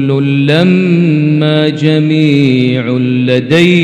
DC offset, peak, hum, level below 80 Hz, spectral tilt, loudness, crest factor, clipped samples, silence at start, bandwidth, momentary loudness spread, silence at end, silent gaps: under 0.1%; 0 dBFS; none; -56 dBFS; -7.5 dB/octave; -10 LUFS; 8 dB; 0.3%; 0 s; 9.6 kHz; 3 LU; 0 s; none